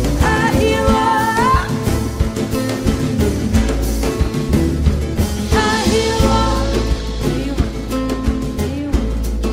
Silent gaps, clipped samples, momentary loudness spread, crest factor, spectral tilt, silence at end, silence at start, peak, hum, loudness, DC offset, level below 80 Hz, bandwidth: none; under 0.1%; 6 LU; 14 dB; -5.5 dB/octave; 0 s; 0 s; -2 dBFS; none; -17 LUFS; under 0.1%; -22 dBFS; 16 kHz